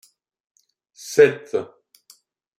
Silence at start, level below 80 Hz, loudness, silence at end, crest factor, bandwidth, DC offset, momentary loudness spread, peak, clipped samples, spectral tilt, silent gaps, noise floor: 1.05 s; -70 dBFS; -19 LUFS; 0.95 s; 22 dB; 15 kHz; under 0.1%; 24 LU; -2 dBFS; under 0.1%; -4.5 dB/octave; none; -56 dBFS